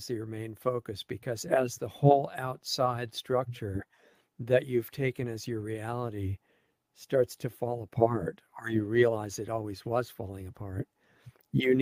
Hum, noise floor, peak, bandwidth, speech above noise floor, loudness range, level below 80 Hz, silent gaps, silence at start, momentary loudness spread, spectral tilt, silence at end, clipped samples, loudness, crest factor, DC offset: none; -72 dBFS; -8 dBFS; 16 kHz; 42 dB; 4 LU; -62 dBFS; none; 0 s; 13 LU; -6 dB/octave; 0 s; under 0.1%; -31 LUFS; 24 dB; under 0.1%